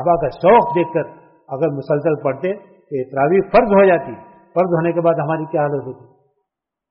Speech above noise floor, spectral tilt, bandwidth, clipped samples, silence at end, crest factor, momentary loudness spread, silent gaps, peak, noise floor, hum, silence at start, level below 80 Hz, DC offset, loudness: 62 dB; -6.5 dB/octave; 5.8 kHz; under 0.1%; 0.95 s; 16 dB; 16 LU; none; -2 dBFS; -78 dBFS; none; 0 s; -48 dBFS; under 0.1%; -17 LUFS